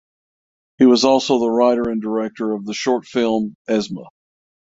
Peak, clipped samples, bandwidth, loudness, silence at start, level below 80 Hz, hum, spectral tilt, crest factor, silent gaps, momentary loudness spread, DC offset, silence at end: -2 dBFS; under 0.1%; 7.8 kHz; -18 LUFS; 0.8 s; -58 dBFS; none; -4.5 dB/octave; 18 dB; 3.55-3.65 s; 9 LU; under 0.1%; 0.6 s